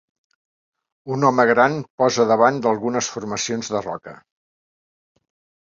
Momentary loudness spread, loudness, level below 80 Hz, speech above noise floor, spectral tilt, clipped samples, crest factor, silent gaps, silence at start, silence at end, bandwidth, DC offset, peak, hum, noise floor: 11 LU; -19 LUFS; -64 dBFS; over 71 dB; -4.5 dB/octave; under 0.1%; 20 dB; 1.90-1.98 s; 1.05 s; 1.5 s; 7.8 kHz; under 0.1%; -2 dBFS; none; under -90 dBFS